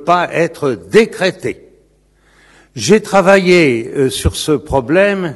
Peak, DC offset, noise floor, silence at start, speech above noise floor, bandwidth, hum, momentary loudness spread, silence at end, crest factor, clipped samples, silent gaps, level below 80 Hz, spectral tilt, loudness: 0 dBFS; under 0.1%; -52 dBFS; 0 s; 40 dB; 12.5 kHz; none; 11 LU; 0 s; 14 dB; 0.4%; none; -34 dBFS; -5 dB/octave; -13 LUFS